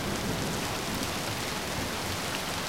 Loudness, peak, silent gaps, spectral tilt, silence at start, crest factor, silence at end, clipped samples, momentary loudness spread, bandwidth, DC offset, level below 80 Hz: -31 LUFS; -16 dBFS; none; -3.5 dB/octave; 0 s; 18 dB; 0 s; under 0.1%; 1 LU; 16.5 kHz; 0.3%; -48 dBFS